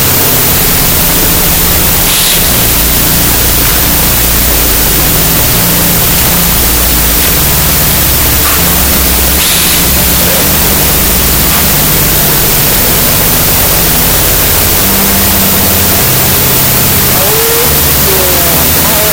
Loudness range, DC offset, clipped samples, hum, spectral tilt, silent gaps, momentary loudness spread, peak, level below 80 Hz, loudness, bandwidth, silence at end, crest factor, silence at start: 0 LU; 0.9%; 1%; none; -2.5 dB/octave; none; 1 LU; 0 dBFS; -18 dBFS; -5 LUFS; over 20 kHz; 0 s; 8 dB; 0 s